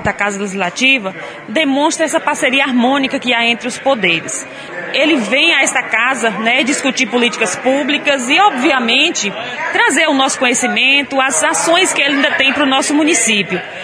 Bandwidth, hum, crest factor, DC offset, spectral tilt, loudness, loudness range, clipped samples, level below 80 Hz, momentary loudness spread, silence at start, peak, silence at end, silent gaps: 11 kHz; none; 14 dB; under 0.1%; -2 dB/octave; -12 LUFS; 3 LU; under 0.1%; -54 dBFS; 7 LU; 0 s; 0 dBFS; 0 s; none